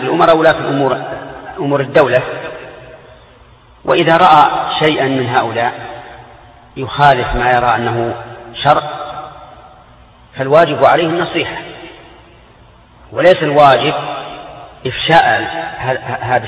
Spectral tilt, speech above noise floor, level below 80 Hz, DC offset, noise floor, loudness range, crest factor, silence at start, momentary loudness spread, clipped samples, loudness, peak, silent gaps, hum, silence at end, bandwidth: -7 dB/octave; 31 dB; -40 dBFS; under 0.1%; -43 dBFS; 3 LU; 14 dB; 0 s; 20 LU; under 0.1%; -12 LUFS; 0 dBFS; none; none; 0 s; 9.4 kHz